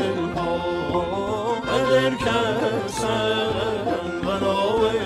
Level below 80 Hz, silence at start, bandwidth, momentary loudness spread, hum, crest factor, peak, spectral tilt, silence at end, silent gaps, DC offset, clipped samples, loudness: -46 dBFS; 0 s; 14 kHz; 5 LU; none; 16 dB; -6 dBFS; -5 dB/octave; 0 s; none; under 0.1%; under 0.1%; -23 LUFS